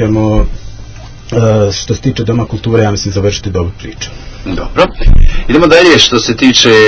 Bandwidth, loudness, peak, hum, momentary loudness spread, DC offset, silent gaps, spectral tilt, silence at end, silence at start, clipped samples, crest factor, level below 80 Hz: 8 kHz; -10 LUFS; 0 dBFS; none; 19 LU; under 0.1%; none; -4.5 dB/octave; 0 s; 0 s; 3%; 8 dB; -16 dBFS